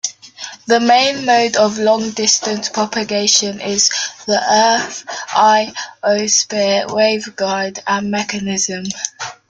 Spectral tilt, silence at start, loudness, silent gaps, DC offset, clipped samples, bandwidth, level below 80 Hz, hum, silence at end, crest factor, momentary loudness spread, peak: -2 dB/octave; 0.05 s; -15 LUFS; none; under 0.1%; under 0.1%; 11 kHz; -58 dBFS; none; 0.15 s; 16 dB; 11 LU; 0 dBFS